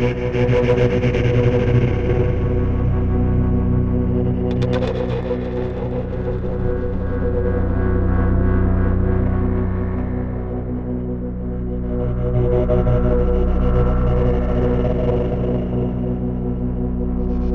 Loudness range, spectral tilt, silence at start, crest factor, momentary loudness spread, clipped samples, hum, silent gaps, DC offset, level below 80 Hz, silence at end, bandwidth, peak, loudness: 4 LU; -9.5 dB/octave; 0 s; 14 dB; 7 LU; under 0.1%; none; none; under 0.1%; -22 dBFS; 0 s; 6.6 kHz; -4 dBFS; -20 LUFS